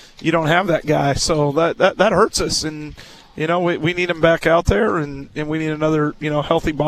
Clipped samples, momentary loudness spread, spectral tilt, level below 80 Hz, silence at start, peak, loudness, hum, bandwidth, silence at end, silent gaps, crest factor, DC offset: under 0.1%; 10 LU; -5 dB/octave; -36 dBFS; 0.2 s; 0 dBFS; -18 LUFS; none; 14 kHz; 0 s; none; 18 dB; under 0.1%